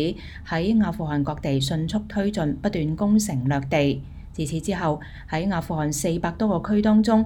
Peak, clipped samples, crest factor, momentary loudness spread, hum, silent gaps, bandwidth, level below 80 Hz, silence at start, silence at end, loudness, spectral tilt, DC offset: -8 dBFS; under 0.1%; 16 dB; 8 LU; none; none; 17 kHz; -42 dBFS; 0 s; 0 s; -24 LUFS; -6 dB/octave; under 0.1%